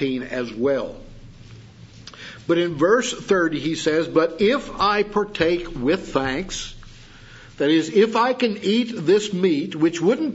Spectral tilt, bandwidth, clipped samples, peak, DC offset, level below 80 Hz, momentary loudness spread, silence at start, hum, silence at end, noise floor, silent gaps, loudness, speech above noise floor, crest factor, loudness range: -5 dB/octave; 8 kHz; under 0.1%; -4 dBFS; under 0.1%; -46 dBFS; 10 LU; 0 s; none; 0 s; -44 dBFS; none; -21 LUFS; 23 dB; 18 dB; 3 LU